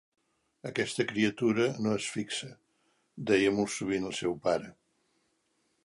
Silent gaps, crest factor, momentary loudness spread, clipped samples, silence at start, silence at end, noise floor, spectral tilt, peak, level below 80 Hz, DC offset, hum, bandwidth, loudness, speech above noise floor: none; 20 dB; 11 LU; under 0.1%; 0.65 s; 1.15 s; -75 dBFS; -4.5 dB/octave; -12 dBFS; -66 dBFS; under 0.1%; none; 11.5 kHz; -30 LUFS; 45 dB